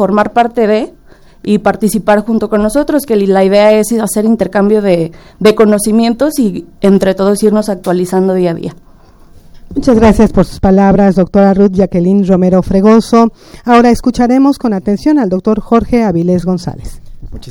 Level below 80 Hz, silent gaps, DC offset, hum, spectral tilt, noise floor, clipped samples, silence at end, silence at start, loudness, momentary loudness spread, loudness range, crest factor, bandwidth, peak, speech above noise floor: -30 dBFS; none; under 0.1%; none; -6.5 dB/octave; -39 dBFS; 0.6%; 0 s; 0 s; -10 LUFS; 7 LU; 4 LU; 10 dB; 17 kHz; 0 dBFS; 29 dB